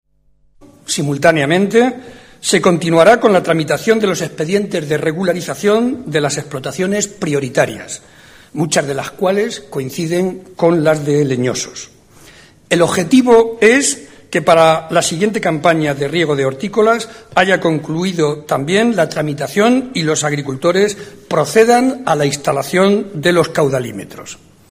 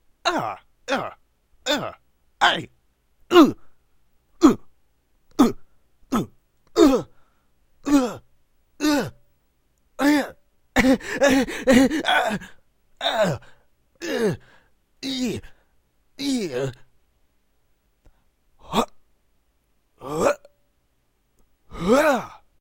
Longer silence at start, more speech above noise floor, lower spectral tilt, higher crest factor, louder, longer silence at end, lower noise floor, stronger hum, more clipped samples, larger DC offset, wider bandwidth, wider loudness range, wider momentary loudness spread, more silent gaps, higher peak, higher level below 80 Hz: first, 0.9 s vs 0.25 s; second, 41 dB vs 45 dB; about the same, -4.5 dB/octave vs -4.5 dB/octave; second, 14 dB vs 24 dB; first, -14 LUFS vs -22 LUFS; about the same, 0.35 s vs 0.25 s; second, -55 dBFS vs -67 dBFS; neither; neither; first, 0.1% vs under 0.1%; about the same, 15.5 kHz vs 16 kHz; second, 5 LU vs 10 LU; second, 11 LU vs 18 LU; neither; about the same, 0 dBFS vs 0 dBFS; about the same, -52 dBFS vs -48 dBFS